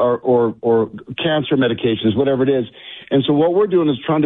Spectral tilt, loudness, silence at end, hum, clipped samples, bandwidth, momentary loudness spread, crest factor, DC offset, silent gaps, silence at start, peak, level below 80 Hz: -10.5 dB/octave; -17 LUFS; 0 s; none; under 0.1%; 4 kHz; 7 LU; 10 dB; under 0.1%; none; 0 s; -6 dBFS; -54 dBFS